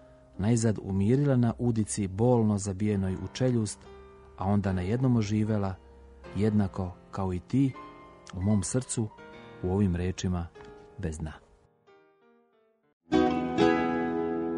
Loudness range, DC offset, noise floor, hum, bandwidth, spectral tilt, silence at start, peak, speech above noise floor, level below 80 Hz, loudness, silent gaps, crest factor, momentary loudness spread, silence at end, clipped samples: 7 LU; under 0.1%; -68 dBFS; none; 10.5 kHz; -6.5 dB/octave; 0.35 s; -10 dBFS; 40 dB; -52 dBFS; -29 LUFS; 12.93-13.01 s; 18 dB; 16 LU; 0 s; under 0.1%